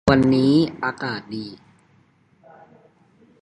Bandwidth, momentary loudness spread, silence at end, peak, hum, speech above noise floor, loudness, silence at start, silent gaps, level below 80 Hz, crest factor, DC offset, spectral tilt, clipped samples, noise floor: 10.5 kHz; 17 LU; 1.85 s; 0 dBFS; none; 39 dB; -20 LUFS; 0.05 s; none; -46 dBFS; 22 dB; under 0.1%; -7 dB/octave; under 0.1%; -58 dBFS